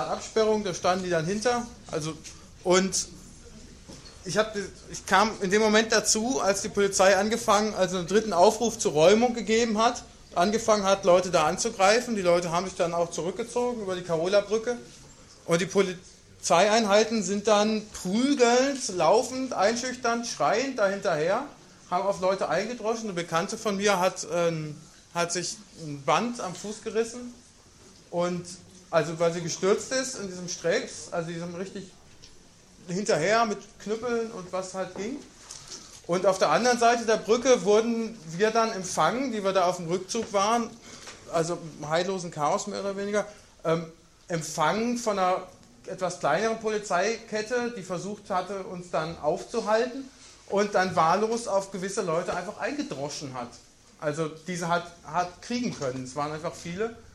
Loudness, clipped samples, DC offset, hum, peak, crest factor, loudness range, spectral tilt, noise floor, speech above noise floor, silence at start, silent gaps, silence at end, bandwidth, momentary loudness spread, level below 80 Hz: -26 LUFS; under 0.1%; under 0.1%; none; -6 dBFS; 20 dB; 8 LU; -3.5 dB/octave; -53 dBFS; 27 dB; 0 s; none; 0.1 s; 14.5 kHz; 14 LU; -58 dBFS